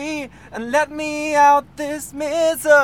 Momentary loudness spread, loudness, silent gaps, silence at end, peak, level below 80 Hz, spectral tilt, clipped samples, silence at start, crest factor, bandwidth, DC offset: 15 LU; -18 LUFS; none; 0 s; -2 dBFS; -52 dBFS; -3 dB/octave; under 0.1%; 0 s; 16 dB; 17.5 kHz; 0.2%